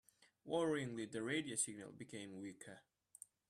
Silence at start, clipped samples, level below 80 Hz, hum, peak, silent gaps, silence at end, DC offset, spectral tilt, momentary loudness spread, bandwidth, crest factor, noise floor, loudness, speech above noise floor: 0.45 s; under 0.1%; -84 dBFS; none; -26 dBFS; none; 0.7 s; under 0.1%; -3.5 dB/octave; 20 LU; 14 kHz; 20 dB; -64 dBFS; -43 LUFS; 20 dB